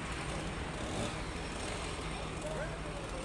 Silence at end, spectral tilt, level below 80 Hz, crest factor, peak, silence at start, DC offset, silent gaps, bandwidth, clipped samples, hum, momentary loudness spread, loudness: 0 s; -4.5 dB/octave; -46 dBFS; 14 dB; -24 dBFS; 0 s; under 0.1%; none; 11.5 kHz; under 0.1%; none; 2 LU; -39 LUFS